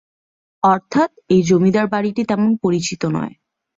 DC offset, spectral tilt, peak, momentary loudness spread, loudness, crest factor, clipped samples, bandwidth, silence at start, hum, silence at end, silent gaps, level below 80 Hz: under 0.1%; -6 dB/octave; -2 dBFS; 7 LU; -17 LUFS; 16 dB; under 0.1%; 7.8 kHz; 0.65 s; none; 0.5 s; none; -56 dBFS